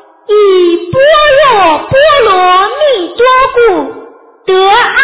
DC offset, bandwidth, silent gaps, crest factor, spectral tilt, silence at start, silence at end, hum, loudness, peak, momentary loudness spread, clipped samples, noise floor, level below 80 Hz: under 0.1%; 4 kHz; none; 6 dB; -8 dB/octave; 0.3 s; 0 s; none; -7 LUFS; 0 dBFS; 6 LU; 0.3%; -33 dBFS; -38 dBFS